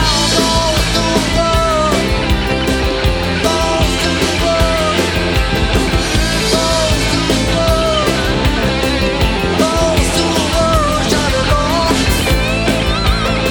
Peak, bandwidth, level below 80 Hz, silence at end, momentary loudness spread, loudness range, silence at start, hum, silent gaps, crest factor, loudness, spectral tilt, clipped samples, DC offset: 0 dBFS; over 20 kHz; -20 dBFS; 0 s; 2 LU; 1 LU; 0 s; none; none; 14 dB; -13 LUFS; -4 dB/octave; under 0.1%; under 0.1%